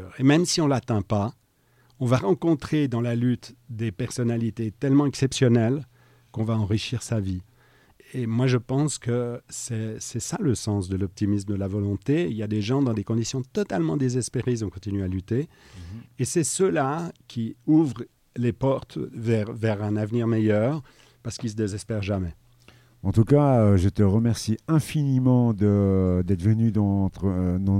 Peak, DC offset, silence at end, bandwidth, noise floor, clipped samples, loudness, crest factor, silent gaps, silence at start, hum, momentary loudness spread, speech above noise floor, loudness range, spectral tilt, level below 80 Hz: -6 dBFS; under 0.1%; 0 s; 14.5 kHz; -62 dBFS; under 0.1%; -24 LUFS; 18 dB; none; 0 s; none; 11 LU; 39 dB; 6 LU; -6.5 dB/octave; -52 dBFS